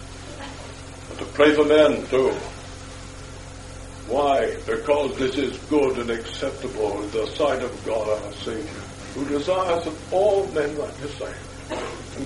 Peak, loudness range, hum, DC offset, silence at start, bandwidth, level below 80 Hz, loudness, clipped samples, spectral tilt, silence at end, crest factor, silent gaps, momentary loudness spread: -4 dBFS; 4 LU; none; under 0.1%; 0 s; 11.5 kHz; -44 dBFS; -23 LUFS; under 0.1%; -5 dB/octave; 0 s; 20 dB; none; 19 LU